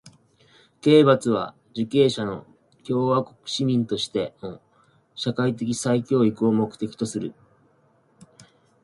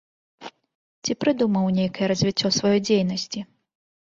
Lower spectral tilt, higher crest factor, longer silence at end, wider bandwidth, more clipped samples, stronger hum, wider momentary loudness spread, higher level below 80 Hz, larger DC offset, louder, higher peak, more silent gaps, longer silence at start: about the same, -6 dB/octave vs -5 dB/octave; about the same, 20 dB vs 16 dB; first, 1.55 s vs 0.7 s; first, 11.5 kHz vs 7.6 kHz; neither; neither; second, 15 LU vs 22 LU; about the same, -64 dBFS vs -60 dBFS; neither; about the same, -23 LUFS vs -22 LUFS; first, -4 dBFS vs -8 dBFS; second, none vs 0.75-1.02 s; second, 0.05 s vs 0.4 s